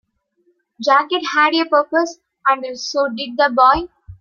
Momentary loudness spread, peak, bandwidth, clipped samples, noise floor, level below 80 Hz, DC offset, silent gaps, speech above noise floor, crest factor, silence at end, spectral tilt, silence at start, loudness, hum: 9 LU; -2 dBFS; 7.4 kHz; under 0.1%; -63 dBFS; -48 dBFS; under 0.1%; none; 47 dB; 16 dB; 0.05 s; -3 dB/octave; 0.8 s; -17 LUFS; none